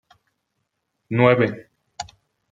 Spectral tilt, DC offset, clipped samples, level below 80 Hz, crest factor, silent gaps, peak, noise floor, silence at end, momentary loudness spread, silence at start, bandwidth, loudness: -7 dB/octave; under 0.1%; under 0.1%; -60 dBFS; 22 dB; none; -2 dBFS; -76 dBFS; 0.5 s; 20 LU; 1.1 s; 8.6 kHz; -19 LUFS